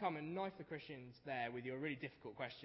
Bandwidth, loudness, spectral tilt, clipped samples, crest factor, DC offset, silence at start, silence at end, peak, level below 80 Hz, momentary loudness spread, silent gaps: 5.6 kHz; -47 LUFS; -4 dB/octave; under 0.1%; 18 dB; under 0.1%; 0 s; 0 s; -28 dBFS; -80 dBFS; 7 LU; none